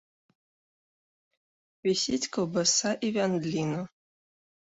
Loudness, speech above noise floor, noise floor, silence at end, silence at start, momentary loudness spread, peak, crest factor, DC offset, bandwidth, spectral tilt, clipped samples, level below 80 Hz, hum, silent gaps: -28 LUFS; over 62 dB; under -90 dBFS; 0.8 s; 1.85 s; 9 LU; -12 dBFS; 20 dB; under 0.1%; 8.2 kHz; -3.5 dB/octave; under 0.1%; -68 dBFS; none; none